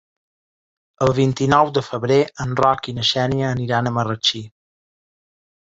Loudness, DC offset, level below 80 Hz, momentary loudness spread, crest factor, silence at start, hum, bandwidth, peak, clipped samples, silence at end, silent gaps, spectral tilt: -19 LUFS; under 0.1%; -50 dBFS; 6 LU; 18 dB; 1 s; none; 8 kHz; -2 dBFS; under 0.1%; 1.3 s; none; -5.5 dB/octave